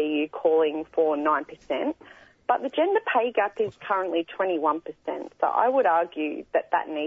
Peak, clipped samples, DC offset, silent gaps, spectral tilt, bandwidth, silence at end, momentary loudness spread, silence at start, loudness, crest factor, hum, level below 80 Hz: -8 dBFS; under 0.1%; under 0.1%; none; -6 dB/octave; 6.8 kHz; 0 s; 9 LU; 0 s; -25 LUFS; 18 dB; none; -70 dBFS